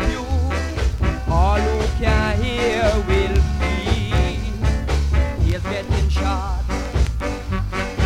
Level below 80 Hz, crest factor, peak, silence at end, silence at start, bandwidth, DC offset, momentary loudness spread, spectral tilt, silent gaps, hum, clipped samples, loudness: -22 dBFS; 14 dB; -4 dBFS; 0 s; 0 s; 11 kHz; under 0.1%; 6 LU; -6 dB/octave; none; none; under 0.1%; -21 LUFS